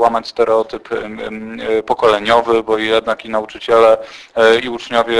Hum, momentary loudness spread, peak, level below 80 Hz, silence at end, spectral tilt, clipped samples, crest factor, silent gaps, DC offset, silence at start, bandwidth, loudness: none; 12 LU; 0 dBFS; -48 dBFS; 0 s; -4 dB/octave; under 0.1%; 14 dB; none; under 0.1%; 0 s; 11 kHz; -15 LUFS